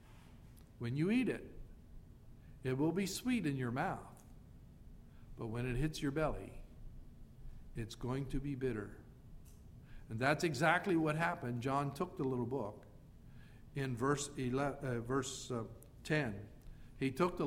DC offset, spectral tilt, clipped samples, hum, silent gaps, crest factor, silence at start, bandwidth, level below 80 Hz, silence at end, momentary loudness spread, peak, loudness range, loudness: under 0.1%; -6 dB/octave; under 0.1%; none; none; 24 dB; 0 s; 16 kHz; -54 dBFS; 0 s; 25 LU; -16 dBFS; 7 LU; -38 LUFS